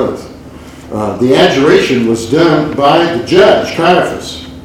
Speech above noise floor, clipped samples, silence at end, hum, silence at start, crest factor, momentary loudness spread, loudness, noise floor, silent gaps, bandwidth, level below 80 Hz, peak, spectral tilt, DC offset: 21 dB; 0.6%; 0.05 s; none; 0 s; 10 dB; 15 LU; -10 LUFS; -31 dBFS; none; 15 kHz; -38 dBFS; 0 dBFS; -5.5 dB/octave; under 0.1%